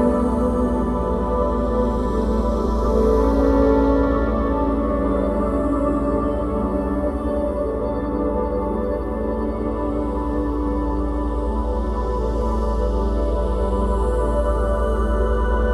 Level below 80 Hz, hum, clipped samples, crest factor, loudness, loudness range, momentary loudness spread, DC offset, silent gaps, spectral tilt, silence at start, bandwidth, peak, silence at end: -24 dBFS; none; under 0.1%; 14 dB; -21 LUFS; 4 LU; 6 LU; under 0.1%; none; -9 dB/octave; 0 s; 10 kHz; -6 dBFS; 0 s